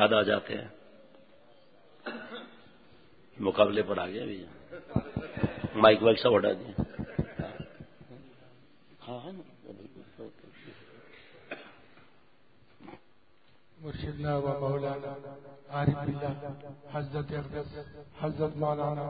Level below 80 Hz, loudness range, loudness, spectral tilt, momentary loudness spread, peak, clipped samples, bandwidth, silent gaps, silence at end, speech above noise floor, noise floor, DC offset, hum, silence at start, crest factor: -54 dBFS; 22 LU; -30 LUFS; -4.5 dB/octave; 26 LU; -6 dBFS; under 0.1%; 4.8 kHz; none; 0 s; 36 dB; -66 dBFS; 0.1%; none; 0 s; 28 dB